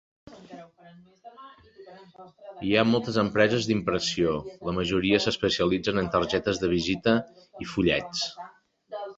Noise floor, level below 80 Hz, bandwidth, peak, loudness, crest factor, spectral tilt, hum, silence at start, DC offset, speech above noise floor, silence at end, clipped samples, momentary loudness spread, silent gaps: -47 dBFS; -52 dBFS; 8 kHz; -6 dBFS; -25 LUFS; 20 dB; -5 dB/octave; none; 0.3 s; under 0.1%; 20 dB; 0.05 s; under 0.1%; 22 LU; none